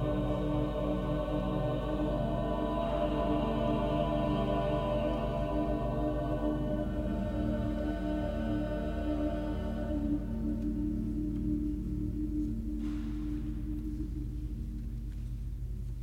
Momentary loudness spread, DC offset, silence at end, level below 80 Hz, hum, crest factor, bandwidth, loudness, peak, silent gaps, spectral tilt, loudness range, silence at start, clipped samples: 8 LU; under 0.1%; 0 s; -38 dBFS; none; 14 dB; 9.2 kHz; -34 LUFS; -18 dBFS; none; -8.5 dB/octave; 5 LU; 0 s; under 0.1%